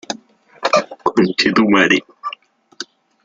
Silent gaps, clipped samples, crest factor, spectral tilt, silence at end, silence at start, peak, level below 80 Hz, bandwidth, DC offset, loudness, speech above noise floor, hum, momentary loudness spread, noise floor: none; under 0.1%; 18 dB; -4.5 dB/octave; 0.4 s; 0.1 s; 0 dBFS; -58 dBFS; 7.8 kHz; under 0.1%; -15 LUFS; 28 dB; none; 20 LU; -43 dBFS